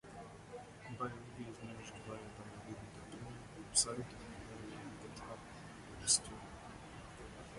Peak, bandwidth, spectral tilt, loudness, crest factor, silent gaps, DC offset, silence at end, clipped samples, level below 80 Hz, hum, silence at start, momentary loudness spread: -18 dBFS; 11.5 kHz; -2 dB/octave; -41 LUFS; 26 dB; none; under 0.1%; 0 s; under 0.1%; -62 dBFS; none; 0.05 s; 19 LU